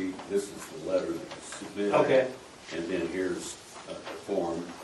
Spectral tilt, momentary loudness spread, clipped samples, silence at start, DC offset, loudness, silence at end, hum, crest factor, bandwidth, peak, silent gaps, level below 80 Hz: -4.5 dB/octave; 15 LU; under 0.1%; 0 s; under 0.1%; -31 LUFS; 0 s; none; 22 dB; 12 kHz; -10 dBFS; none; -66 dBFS